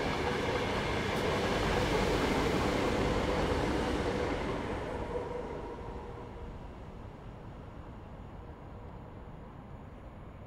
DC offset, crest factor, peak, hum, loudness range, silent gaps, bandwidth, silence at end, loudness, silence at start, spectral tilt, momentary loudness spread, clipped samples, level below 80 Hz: under 0.1%; 18 dB; -18 dBFS; none; 17 LU; none; 16 kHz; 0 s; -33 LUFS; 0 s; -5.5 dB/octave; 18 LU; under 0.1%; -44 dBFS